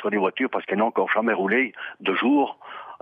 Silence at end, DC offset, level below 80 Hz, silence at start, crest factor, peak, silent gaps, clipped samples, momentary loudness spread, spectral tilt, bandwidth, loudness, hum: 0.05 s; under 0.1%; -78 dBFS; 0 s; 16 dB; -8 dBFS; none; under 0.1%; 8 LU; -8 dB/octave; 4.7 kHz; -23 LUFS; none